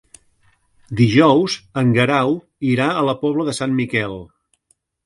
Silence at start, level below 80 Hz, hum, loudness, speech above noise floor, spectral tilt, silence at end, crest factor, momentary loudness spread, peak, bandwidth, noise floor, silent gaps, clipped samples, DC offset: 0.9 s; -52 dBFS; none; -17 LUFS; 47 dB; -6 dB/octave; 0.8 s; 18 dB; 9 LU; 0 dBFS; 11.5 kHz; -64 dBFS; none; under 0.1%; under 0.1%